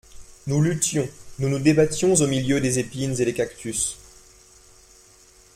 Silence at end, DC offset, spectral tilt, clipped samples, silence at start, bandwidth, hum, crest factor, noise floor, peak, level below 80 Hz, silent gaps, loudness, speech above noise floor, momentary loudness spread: 1.6 s; under 0.1%; -5 dB/octave; under 0.1%; 0.15 s; 16 kHz; none; 20 dB; -52 dBFS; -4 dBFS; -50 dBFS; none; -22 LUFS; 31 dB; 9 LU